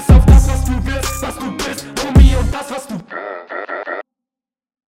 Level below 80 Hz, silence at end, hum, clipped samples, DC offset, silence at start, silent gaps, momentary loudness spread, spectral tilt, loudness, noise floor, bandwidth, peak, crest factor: -16 dBFS; 0.9 s; none; under 0.1%; under 0.1%; 0 s; none; 16 LU; -6 dB/octave; -16 LUFS; -89 dBFS; 16.5 kHz; 0 dBFS; 14 dB